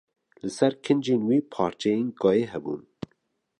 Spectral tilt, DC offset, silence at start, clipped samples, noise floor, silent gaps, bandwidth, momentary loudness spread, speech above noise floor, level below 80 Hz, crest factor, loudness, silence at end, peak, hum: -6.5 dB/octave; under 0.1%; 0.45 s; under 0.1%; -72 dBFS; none; 11 kHz; 15 LU; 48 dB; -64 dBFS; 18 dB; -25 LUFS; 0.8 s; -8 dBFS; none